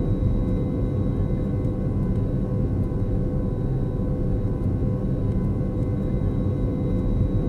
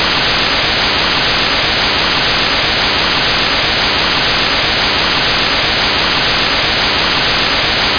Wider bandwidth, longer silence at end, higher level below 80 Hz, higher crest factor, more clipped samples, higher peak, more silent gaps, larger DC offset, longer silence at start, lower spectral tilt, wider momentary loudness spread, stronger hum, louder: second, 4.3 kHz vs 5.4 kHz; about the same, 0 s vs 0 s; about the same, -28 dBFS vs -30 dBFS; about the same, 12 dB vs 12 dB; neither; second, -10 dBFS vs -2 dBFS; neither; first, 0.1% vs under 0.1%; about the same, 0 s vs 0 s; first, -11 dB/octave vs -3 dB/octave; about the same, 2 LU vs 0 LU; neither; second, -25 LUFS vs -11 LUFS